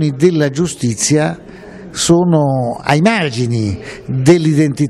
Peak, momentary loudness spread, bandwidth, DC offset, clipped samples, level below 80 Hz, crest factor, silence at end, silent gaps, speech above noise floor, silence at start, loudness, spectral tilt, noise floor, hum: 0 dBFS; 13 LU; 13 kHz; under 0.1%; under 0.1%; -44 dBFS; 14 dB; 0 s; none; 20 dB; 0 s; -14 LUFS; -5.5 dB/octave; -33 dBFS; none